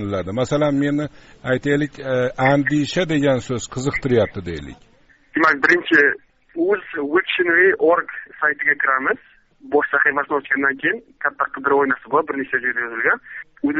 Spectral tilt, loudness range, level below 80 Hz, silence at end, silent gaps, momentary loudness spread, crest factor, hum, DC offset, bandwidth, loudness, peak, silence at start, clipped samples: -4 dB/octave; 3 LU; -50 dBFS; 0 s; none; 11 LU; 18 dB; none; under 0.1%; 8 kHz; -19 LUFS; -2 dBFS; 0 s; under 0.1%